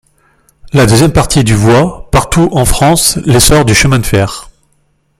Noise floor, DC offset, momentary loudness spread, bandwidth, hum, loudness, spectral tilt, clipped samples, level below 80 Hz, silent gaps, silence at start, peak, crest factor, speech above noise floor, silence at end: -55 dBFS; under 0.1%; 7 LU; over 20 kHz; none; -8 LUFS; -4.5 dB/octave; 0.1%; -22 dBFS; none; 0.65 s; 0 dBFS; 10 dB; 48 dB; 0.75 s